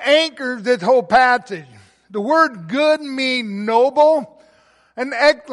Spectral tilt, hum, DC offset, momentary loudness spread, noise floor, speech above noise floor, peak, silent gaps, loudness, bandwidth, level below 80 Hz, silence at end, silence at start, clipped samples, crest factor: -4 dB/octave; none; under 0.1%; 13 LU; -54 dBFS; 38 dB; -2 dBFS; none; -16 LUFS; 11.5 kHz; -60 dBFS; 0 s; 0 s; under 0.1%; 14 dB